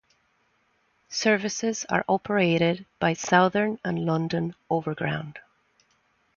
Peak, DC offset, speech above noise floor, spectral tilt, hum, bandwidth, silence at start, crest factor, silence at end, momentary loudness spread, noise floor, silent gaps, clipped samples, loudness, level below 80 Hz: -6 dBFS; under 0.1%; 44 dB; -5 dB/octave; none; 7.2 kHz; 1.1 s; 22 dB; 0.95 s; 9 LU; -68 dBFS; none; under 0.1%; -25 LUFS; -62 dBFS